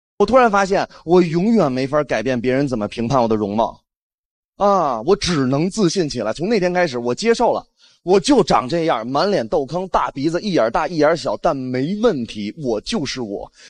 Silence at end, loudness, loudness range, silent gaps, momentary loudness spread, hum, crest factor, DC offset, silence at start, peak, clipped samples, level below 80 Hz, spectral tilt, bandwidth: 0 s; -18 LUFS; 2 LU; 3.97-4.53 s; 8 LU; none; 16 dB; under 0.1%; 0.2 s; -2 dBFS; under 0.1%; -44 dBFS; -5.5 dB/octave; 10.5 kHz